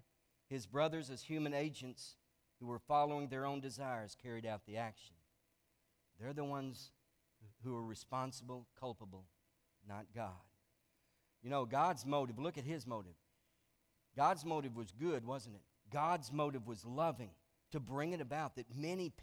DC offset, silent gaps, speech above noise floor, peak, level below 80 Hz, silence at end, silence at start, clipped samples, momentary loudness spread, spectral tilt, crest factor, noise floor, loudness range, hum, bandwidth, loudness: under 0.1%; none; 38 dB; -22 dBFS; -76 dBFS; 0 s; 0.5 s; under 0.1%; 17 LU; -6 dB/octave; 22 dB; -80 dBFS; 9 LU; none; over 20 kHz; -42 LUFS